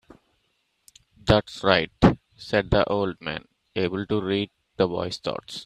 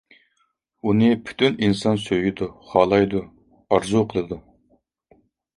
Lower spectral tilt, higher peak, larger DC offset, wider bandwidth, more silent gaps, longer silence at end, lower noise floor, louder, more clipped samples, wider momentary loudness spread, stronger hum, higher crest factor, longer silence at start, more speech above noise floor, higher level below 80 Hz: about the same, -6.5 dB/octave vs -6.5 dB/octave; about the same, -2 dBFS vs -2 dBFS; neither; first, 13 kHz vs 11.5 kHz; neither; second, 0 s vs 1.2 s; about the same, -72 dBFS vs -69 dBFS; second, -24 LUFS vs -21 LUFS; neither; about the same, 13 LU vs 11 LU; neither; about the same, 24 dB vs 20 dB; first, 1.25 s vs 0.85 s; about the same, 47 dB vs 49 dB; first, -42 dBFS vs -52 dBFS